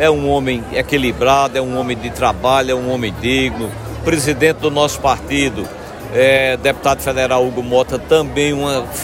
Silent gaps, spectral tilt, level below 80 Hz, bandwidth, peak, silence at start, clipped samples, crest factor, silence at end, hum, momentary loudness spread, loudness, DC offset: none; -4.5 dB/octave; -36 dBFS; 16.5 kHz; 0 dBFS; 0 s; under 0.1%; 16 dB; 0 s; none; 7 LU; -16 LUFS; under 0.1%